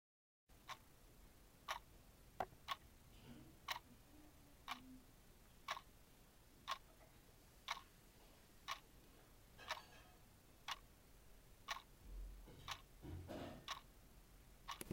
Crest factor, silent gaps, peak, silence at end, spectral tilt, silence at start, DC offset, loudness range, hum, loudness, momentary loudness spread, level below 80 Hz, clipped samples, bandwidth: 28 dB; none; -28 dBFS; 0 s; -3 dB/octave; 0.5 s; under 0.1%; 2 LU; none; -54 LUFS; 17 LU; -66 dBFS; under 0.1%; 16 kHz